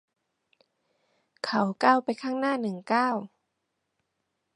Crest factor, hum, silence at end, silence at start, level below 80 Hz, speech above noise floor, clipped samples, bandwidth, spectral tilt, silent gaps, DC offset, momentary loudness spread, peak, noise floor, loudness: 24 dB; none; 1.3 s; 1.45 s; -82 dBFS; 54 dB; under 0.1%; 11.5 kHz; -5.5 dB/octave; none; under 0.1%; 11 LU; -6 dBFS; -80 dBFS; -27 LUFS